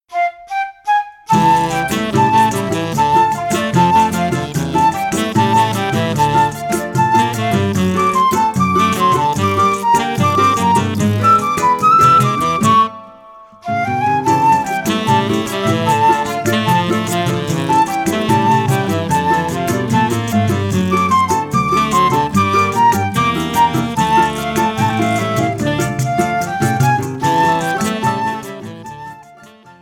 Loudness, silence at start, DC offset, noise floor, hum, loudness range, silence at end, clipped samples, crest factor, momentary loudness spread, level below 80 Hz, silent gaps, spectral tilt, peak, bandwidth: -14 LUFS; 0.1 s; under 0.1%; -41 dBFS; none; 3 LU; 0.1 s; under 0.1%; 14 dB; 6 LU; -44 dBFS; none; -5 dB/octave; 0 dBFS; 19 kHz